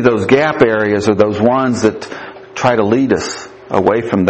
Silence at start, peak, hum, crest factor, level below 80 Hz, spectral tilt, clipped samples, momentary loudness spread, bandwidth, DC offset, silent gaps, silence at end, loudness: 0 s; 0 dBFS; none; 14 dB; -48 dBFS; -6 dB/octave; under 0.1%; 15 LU; 8.6 kHz; under 0.1%; none; 0 s; -13 LUFS